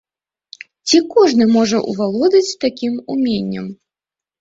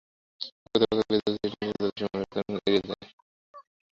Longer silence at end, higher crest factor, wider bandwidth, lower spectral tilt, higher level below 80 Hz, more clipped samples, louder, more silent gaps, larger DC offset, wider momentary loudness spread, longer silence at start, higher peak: first, 0.65 s vs 0.4 s; second, 14 dB vs 22 dB; about the same, 8 kHz vs 7.6 kHz; second, -4.5 dB/octave vs -6.5 dB/octave; about the same, -58 dBFS vs -60 dBFS; neither; first, -15 LUFS vs -29 LUFS; second, none vs 0.52-0.66 s, 3.13-3.54 s; neither; about the same, 13 LU vs 14 LU; first, 0.85 s vs 0.4 s; first, -2 dBFS vs -8 dBFS